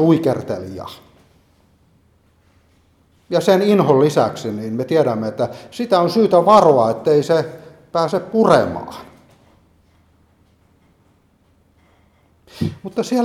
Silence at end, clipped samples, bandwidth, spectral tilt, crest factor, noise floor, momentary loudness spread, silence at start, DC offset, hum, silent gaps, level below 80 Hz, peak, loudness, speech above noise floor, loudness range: 0 s; under 0.1%; 15 kHz; -6.5 dB/octave; 18 dB; -57 dBFS; 15 LU; 0 s; under 0.1%; none; none; -56 dBFS; 0 dBFS; -16 LUFS; 41 dB; 13 LU